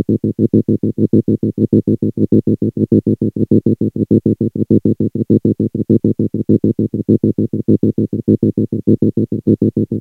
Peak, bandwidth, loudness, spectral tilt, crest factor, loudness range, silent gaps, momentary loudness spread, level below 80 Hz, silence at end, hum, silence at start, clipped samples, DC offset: 0 dBFS; 1.3 kHz; -15 LUFS; -13 dB/octave; 14 dB; 0 LU; none; 4 LU; -46 dBFS; 0 s; none; 0 s; under 0.1%; under 0.1%